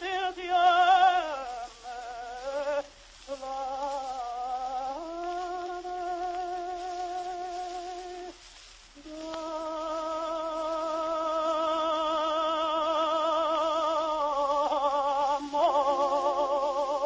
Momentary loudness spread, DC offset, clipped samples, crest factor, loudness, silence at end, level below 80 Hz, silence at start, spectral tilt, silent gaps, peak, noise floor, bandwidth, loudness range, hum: 15 LU; under 0.1%; under 0.1%; 18 dB; -29 LUFS; 0 s; -60 dBFS; 0 s; -2.5 dB/octave; none; -10 dBFS; -51 dBFS; 8 kHz; 9 LU; none